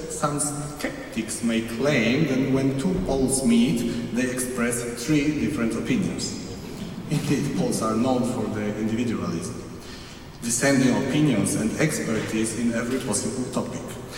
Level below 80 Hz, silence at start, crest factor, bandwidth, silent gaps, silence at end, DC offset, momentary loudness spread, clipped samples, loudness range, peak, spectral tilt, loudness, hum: -46 dBFS; 0 s; 16 dB; 16.5 kHz; none; 0 s; under 0.1%; 12 LU; under 0.1%; 3 LU; -8 dBFS; -5 dB/octave; -24 LUFS; none